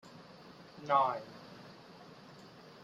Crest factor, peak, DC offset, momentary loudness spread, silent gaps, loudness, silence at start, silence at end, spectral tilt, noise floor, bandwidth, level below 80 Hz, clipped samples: 24 dB; -14 dBFS; under 0.1%; 24 LU; none; -32 LUFS; 0.15 s; 0.35 s; -5.5 dB/octave; -55 dBFS; 13.5 kHz; -80 dBFS; under 0.1%